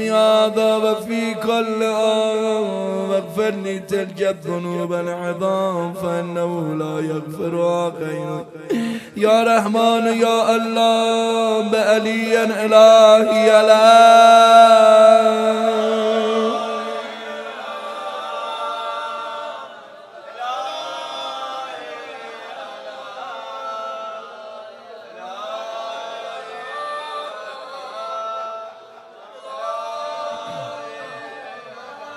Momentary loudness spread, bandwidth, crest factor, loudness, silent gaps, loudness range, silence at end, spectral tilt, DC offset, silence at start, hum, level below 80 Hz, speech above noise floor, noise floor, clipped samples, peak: 23 LU; 14 kHz; 18 dB; -16 LUFS; none; 20 LU; 0 s; -4.5 dB/octave; under 0.1%; 0 s; none; -72 dBFS; 27 dB; -42 dBFS; under 0.1%; 0 dBFS